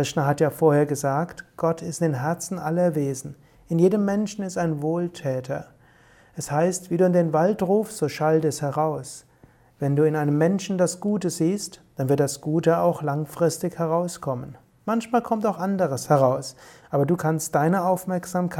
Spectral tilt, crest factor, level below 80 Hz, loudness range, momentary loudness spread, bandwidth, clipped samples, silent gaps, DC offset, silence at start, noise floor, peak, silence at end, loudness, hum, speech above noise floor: -6.5 dB/octave; 18 dB; -62 dBFS; 2 LU; 10 LU; 17 kHz; under 0.1%; none; under 0.1%; 0 s; -55 dBFS; -6 dBFS; 0 s; -24 LUFS; none; 32 dB